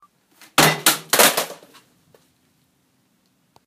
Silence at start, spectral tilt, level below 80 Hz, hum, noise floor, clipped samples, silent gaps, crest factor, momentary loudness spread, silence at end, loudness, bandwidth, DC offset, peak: 0.6 s; -1.5 dB/octave; -64 dBFS; none; -64 dBFS; under 0.1%; none; 22 dB; 10 LU; 2.15 s; -16 LUFS; 16 kHz; under 0.1%; 0 dBFS